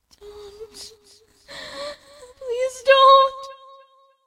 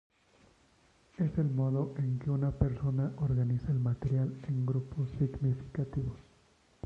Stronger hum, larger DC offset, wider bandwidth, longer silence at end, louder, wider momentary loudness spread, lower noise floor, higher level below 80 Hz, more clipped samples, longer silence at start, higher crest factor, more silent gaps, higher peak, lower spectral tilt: neither; neither; first, 12.5 kHz vs 5.2 kHz; about the same, 0.75 s vs 0.65 s; first, -16 LUFS vs -33 LUFS; first, 28 LU vs 5 LU; second, -55 dBFS vs -66 dBFS; second, -62 dBFS vs -50 dBFS; neither; second, 0.6 s vs 1.2 s; about the same, 20 dB vs 20 dB; neither; first, -2 dBFS vs -14 dBFS; second, 0 dB/octave vs -10.5 dB/octave